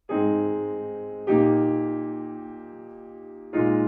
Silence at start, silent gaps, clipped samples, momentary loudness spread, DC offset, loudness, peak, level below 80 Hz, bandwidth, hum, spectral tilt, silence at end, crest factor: 0.1 s; none; under 0.1%; 21 LU; under 0.1%; -25 LUFS; -8 dBFS; -66 dBFS; 3.6 kHz; none; -12 dB/octave; 0 s; 16 dB